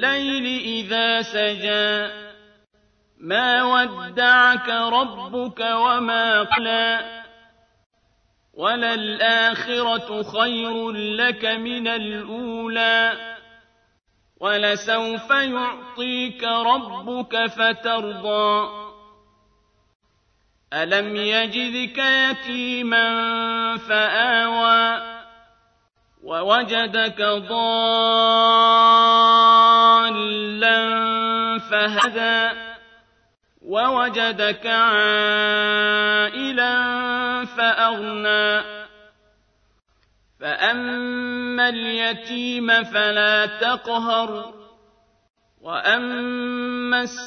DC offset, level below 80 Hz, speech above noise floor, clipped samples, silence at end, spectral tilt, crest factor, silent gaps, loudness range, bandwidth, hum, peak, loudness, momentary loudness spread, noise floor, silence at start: under 0.1%; -64 dBFS; 45 dB; under 0.1%; 0 s; -3 dB/octave; 18 dB; 7.86-7.90 s, 19.95-20.00 s, 45.30-45.34 s; 9 LU; 8.6 kHz; none; -4 dBFS; -19 LUFS; 12 LU; -64 dBFS; 0 s